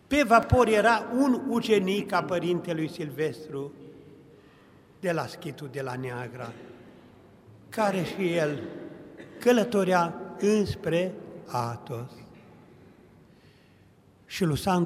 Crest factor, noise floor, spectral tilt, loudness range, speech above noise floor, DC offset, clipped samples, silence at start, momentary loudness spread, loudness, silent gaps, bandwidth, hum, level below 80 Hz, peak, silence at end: 22 dB; -58 dBFS; -6 dB/octave; 10 LU; 32 dB; under 0.1%; under 0.1%; 0.1 s; 19 LU; -27 LUFS; none; 16 kHz; none; -52 dBFS; -6 dBFS; 0 s